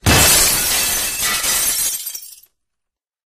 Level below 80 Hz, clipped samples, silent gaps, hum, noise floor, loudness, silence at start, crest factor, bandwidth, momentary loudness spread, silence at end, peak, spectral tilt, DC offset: -34 dBFS; under 0.1%; none; none; -81 dBFS; -14 LUFS; 0.05 s; 18 dB; 15.5 kHz; 14 LU; 1 s; 0 dBFS; -1.5 dB/octave; under 0.1%